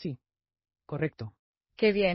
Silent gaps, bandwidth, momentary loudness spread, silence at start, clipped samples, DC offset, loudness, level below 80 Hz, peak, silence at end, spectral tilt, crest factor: 1.39-1.54 s; 5.8 kHz; 18 LU; 0 s; under 0.1%; under 0.1%; -30 LUFS; -60 dBFS; -12 dBFS; 0 s; -4.5 dB/octave; 20 dB